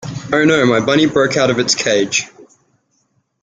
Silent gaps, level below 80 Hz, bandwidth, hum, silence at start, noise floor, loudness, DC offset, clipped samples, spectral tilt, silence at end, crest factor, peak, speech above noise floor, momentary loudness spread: none; -52 dBFS; 9.6 kHz; none; 0 s; -63 dBFS; -14 LUFS; under 0.1%; under 0.1%; -3.5 dB/octave; 1 s; 16 dB; 0 dBFS; 50 dB; 7 LU